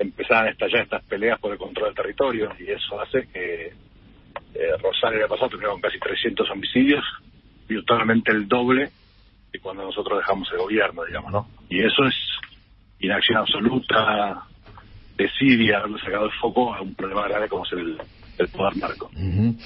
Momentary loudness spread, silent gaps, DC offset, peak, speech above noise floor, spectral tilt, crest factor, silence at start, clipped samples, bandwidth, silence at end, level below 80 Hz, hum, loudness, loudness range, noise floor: 12 LU; none; under 0.1%; -2 dBFS; 31 dB; -10 dB/octave; 22 dB; 0 s; under 0.1%; 5.8 kHz; 0 s; -50 dBFS; none; -22 LUFS; 4 LU; -53 dBFS